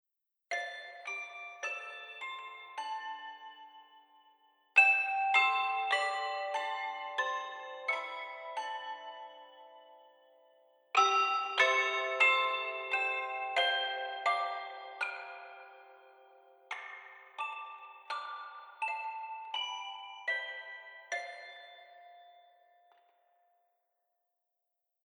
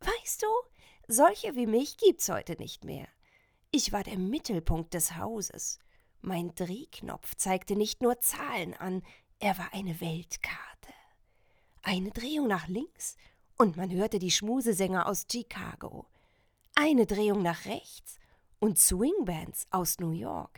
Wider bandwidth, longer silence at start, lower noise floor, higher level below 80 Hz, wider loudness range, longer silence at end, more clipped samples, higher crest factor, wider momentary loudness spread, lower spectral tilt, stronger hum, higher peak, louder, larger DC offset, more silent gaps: second, 11.5 kHz vs over 20 kHz; first, 0.5 s vs 0 s; first, -86 dBFS vs -68 dBFS; second, under -90 dBFS vs -48 dBFS; first, 14 LU vs 7 LU; first, 2.75 s vs 0.1 s; neither; about the same, 24 dB vs 26 dB; first, 21 LU vs 15 LU; second, 2 dB/octave vs -3.5 dB/octave; neither; second, -12 dBFS vs -6 dBFS; second, -33 LUFS vs -30 LUFS; neither; neither